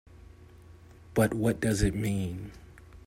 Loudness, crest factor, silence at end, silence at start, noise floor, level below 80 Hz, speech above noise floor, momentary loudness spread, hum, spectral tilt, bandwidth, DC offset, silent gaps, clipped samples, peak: -29 LUFS; 20 dB; 0.05 s; 0.15 s; -52 dBFS; -44 dBFS; 24 dB; 12 LU; none; -6 dB/octave; 16 kHz; under 0.1%; none; under 0.1%; -12 dBFS